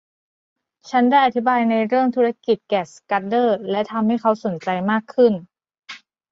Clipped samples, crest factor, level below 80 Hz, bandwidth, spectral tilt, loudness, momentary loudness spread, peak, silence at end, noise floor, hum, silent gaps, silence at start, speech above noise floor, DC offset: under 0.1%; 16 dB; -68 dBFS; 7.8 kHz; -6.5 dB/octave; -19 LUFS; 8 LU; -4 dBFS; 0.35 s; -42 dBFS; none; none; 0.85 s; 23 dB; under 0.1%